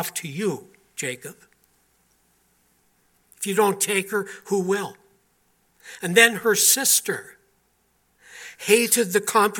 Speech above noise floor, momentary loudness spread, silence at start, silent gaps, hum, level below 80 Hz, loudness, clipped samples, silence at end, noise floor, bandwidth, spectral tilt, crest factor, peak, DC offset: 44 dB; 20 LU; 0 s; none; none; -74 dBFS; -21 LUFS; under 0.1%; 0 s; -66 dBFS; 17.5 kHz; -2 dB/octave; 24 dB; 0 dBFS; under 0.1%